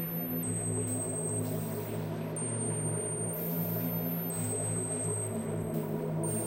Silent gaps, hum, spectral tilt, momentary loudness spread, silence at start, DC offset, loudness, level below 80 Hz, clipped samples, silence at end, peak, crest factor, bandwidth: none; none; -5.5 dB/octave; 3 LU; 0 s; under 0.1%; -33 LUFS; -62 dBFS; under 0.1%; 0 s; -20 dBFS; 14 dB; 16 kHz